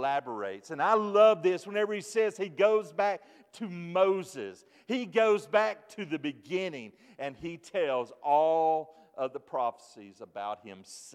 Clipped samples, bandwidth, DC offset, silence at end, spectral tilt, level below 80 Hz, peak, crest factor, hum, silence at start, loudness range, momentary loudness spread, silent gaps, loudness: under 0.1%; 13 kHz; under 0.1%; 0.05 s; -5 dB/octave; -78 dBFS; -10 dBFS; 20 dB; none; 0 s; 4 LU; 16 LU; none; -29 LUFS